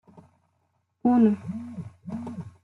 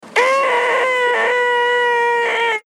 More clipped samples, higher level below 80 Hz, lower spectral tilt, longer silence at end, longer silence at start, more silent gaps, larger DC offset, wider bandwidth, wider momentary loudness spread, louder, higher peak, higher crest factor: neither; first, -68 dBFS vs -88 dBFS; first, -10 dB/octave vs -0.5 dB/octave; about the same, 0.15 s vs 0.05 s; about the same, 0.15 s vs 0.05 s; neither; neither; second, 4 kHz vs 12.5 kHz; first, 18 LU vs 1 LU; second, -25 LUFS vs -15 LUFS; second, -10 dBFS vs -2 dBFS; about the same, 18 dB vs 14 dB